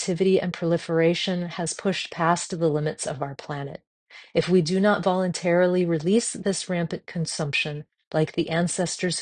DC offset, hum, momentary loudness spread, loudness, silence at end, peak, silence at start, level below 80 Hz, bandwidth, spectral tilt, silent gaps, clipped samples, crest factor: under 0.1%; none; 9 LU; -24 LUFS; 0 s; -6 dBFS; 0 s; -62 dBFS; 10 kHz; -5 dB/octave; 3.87-4.06 s, 8.07-8.11 s; under 0.1%; 18 dB